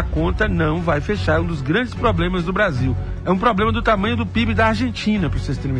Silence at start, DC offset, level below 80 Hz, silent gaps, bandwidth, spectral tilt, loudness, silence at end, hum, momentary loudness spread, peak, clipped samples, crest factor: 0 s; under 0.1%; -28 dBFS; none; 10 kHz; -7 dB/octave; -19 LUFS; 0 s; none; 4 LU; -6 dBFS; under 0.1%; 14 dB